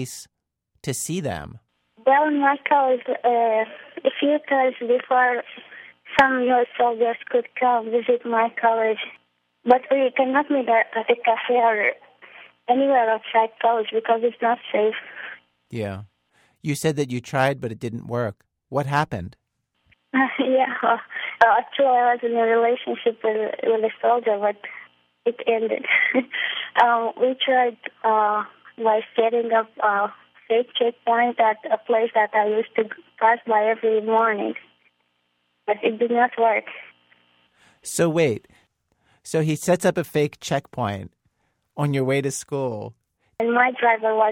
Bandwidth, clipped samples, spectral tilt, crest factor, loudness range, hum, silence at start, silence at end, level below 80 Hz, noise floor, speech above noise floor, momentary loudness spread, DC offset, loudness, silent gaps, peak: 16 kHz; under 0.1%; -5 dB/octave; 20 dB; 5 LU; none; 0 s; 0 s; -64 dBFS; -72 dBFS; 51 dB; 12 LU; under 0.1%; -21 LUFS; none; -2 dBFS